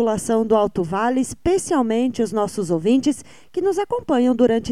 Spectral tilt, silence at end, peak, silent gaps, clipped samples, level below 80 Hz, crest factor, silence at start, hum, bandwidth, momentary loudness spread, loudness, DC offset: -5.5 dB/octave; 0 s; -4 dBFS; none; under 0.1%; -48 dBFS; 14 dB; 0 s; none; 14 kHz; 6 LU; -20 LUFS; 0.5%